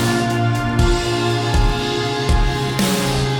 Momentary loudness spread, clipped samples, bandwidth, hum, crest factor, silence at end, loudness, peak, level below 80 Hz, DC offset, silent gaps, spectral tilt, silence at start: 2 LU; under 0.1%; 19.5 kHz; none; 14 dB; 0 s; -18 LUFS; -4 dBFS; -22 dBFS; under 0.1%; none; -5 dB/octave; 0 s